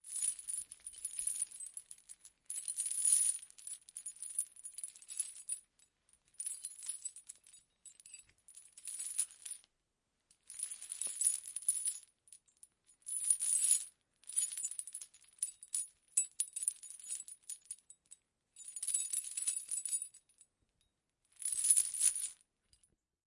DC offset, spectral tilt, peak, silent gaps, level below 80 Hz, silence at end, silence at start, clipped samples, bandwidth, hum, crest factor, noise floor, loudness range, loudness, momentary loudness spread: under 0.1%; 4.5 dB/octave; -10 dBFS; none; -86 dBFS; 0.95 s; 0.05 s; under 0.1%; 12 kHz; none; 30 dB; -84 dBFS; 10 LU; -35 LUFS; 21 LU